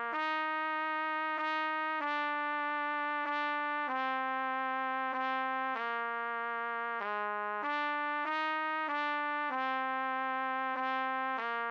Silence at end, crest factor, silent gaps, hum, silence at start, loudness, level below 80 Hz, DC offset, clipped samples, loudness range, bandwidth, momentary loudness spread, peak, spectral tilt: 0 s; 12 dB; none; none; 0 s; -34 LUFS; under -90 dBFS; under 0.1%; under 0.1%; 1 LU; 7.2 kHz; 2 LU; -22 dBFS; -3.5 dB/octave